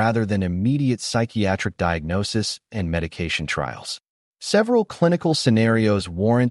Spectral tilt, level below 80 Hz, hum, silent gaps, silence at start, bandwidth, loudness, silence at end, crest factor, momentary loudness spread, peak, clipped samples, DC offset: -5.5 dB/octave; -44 dBFS; none; 4.09-4.32 s; 0 s; 11.5 kHz; -22 LUFS; 0 s; 16 dB; 8 LU; -6 dBFS; under 0.1%; under 0.1%